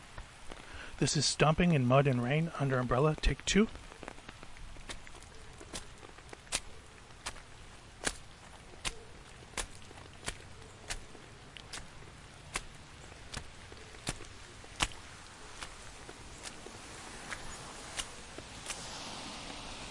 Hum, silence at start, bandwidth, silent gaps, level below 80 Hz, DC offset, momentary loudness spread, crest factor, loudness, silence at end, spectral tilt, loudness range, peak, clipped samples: none; 0 s; 11.5 kHz; none; -50 dBFS; under 0.1%; 22 LU; 26 dB; -35 LUFS; 0 s; -4.5 dB/octave; 15 LU; -12 dBFS; under 0.1%